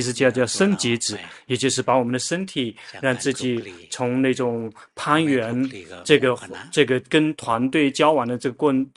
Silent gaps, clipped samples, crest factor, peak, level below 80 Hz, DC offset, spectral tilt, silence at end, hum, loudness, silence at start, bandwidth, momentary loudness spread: none; under 0.1%; 20 dB; 0 dBFS; -62 dBFS; under 0.1%; -4.5 dB/octave; 0.1 s; none; -21 LUFS; 0 s; 11.5 kHz; 11 LU